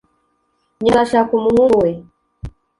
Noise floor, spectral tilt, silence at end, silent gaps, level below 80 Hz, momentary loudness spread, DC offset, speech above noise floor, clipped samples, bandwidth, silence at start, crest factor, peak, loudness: -65 dBFS; -6.5 dB/octave; 0.3 s; none; -42 dBFS; 23 LU; under 0.1%; 51 dB; under 0.1%; 11.5 kHz; 0.8 s; 16 dB; -2 dBFS; -15 LUFS